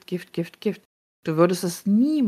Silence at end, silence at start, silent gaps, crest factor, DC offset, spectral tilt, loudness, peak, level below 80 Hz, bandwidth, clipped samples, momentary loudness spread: 0 s; 0.1 s; 0.85-1.23 s; 18 dB; under 0.1%; -6.5 dB/octave; -24 LUFS; -6 dBFS; -72 dBFS; 15 kHz; under 0.1%; 12 LU